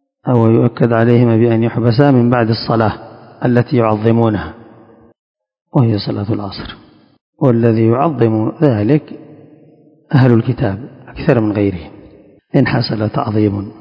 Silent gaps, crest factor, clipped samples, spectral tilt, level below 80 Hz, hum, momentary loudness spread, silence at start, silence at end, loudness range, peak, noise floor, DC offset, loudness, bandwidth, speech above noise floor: 5.19-5.35 s, 7.21-7.33 s; 14 dB; 0.3%; -10.5 dB/octave; -42 dBFS; none; 10 LU; 0.25 s; 0.1 s; 4 LU; 0 dBFS; -46 dBFS; under 0.1%; -14 LUFS; 5.4 kHz; 34 dB